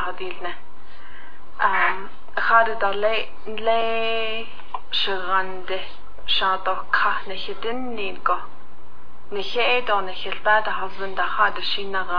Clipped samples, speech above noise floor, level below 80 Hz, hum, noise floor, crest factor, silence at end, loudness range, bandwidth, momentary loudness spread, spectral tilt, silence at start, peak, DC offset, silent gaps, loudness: under 0.1%; 24 dB; -54 dBFS; none; -48 dBFS; 20 dB; 0 s; 3 LU; 5.4 kHz; 13 LU; -4.5 dB/octave; 0 s; -4 dBFS; 8%; none; -23 LUFS